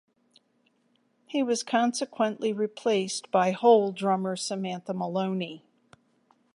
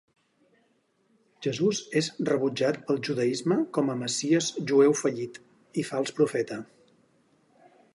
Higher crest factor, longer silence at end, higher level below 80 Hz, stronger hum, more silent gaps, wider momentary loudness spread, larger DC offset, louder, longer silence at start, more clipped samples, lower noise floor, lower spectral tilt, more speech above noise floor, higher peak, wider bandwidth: about the same, 20 dB vs 18 dB; second, 0.95 s vs 1.3 s; second, -82 dBFS vs -76 dBFS; neither; neither; about the same, 11 LU vs 12 LU; neither; about the same, -27 LUFS vs -27 LUFS; about the same, 1.3 s vs 1.4 s; neither; about the same, -70 dBFS vs -69 dBFS; about the same, -4.5 dB/octave vs -4.5 dB/octave; about the same, 43 dB vs 43 dB; about the same, -8 dBFS vs -10 dBFS; about the same, 11.5 kHz vs 11.5 kHz